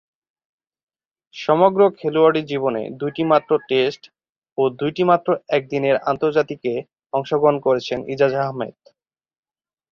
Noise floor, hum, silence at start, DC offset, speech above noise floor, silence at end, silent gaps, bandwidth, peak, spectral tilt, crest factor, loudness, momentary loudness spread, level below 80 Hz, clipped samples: under -90 dBFS; none; 1.35 s; under 0.1%; over 71 dB; 1.2 s; 4.29-4.42 s, 4.52-4.56 s; 6.8 kHz; -2 dBFS; -7 dB/octave; 18 dB; -19 LUFS; 10 LU; -64 dBFS; under 0.1%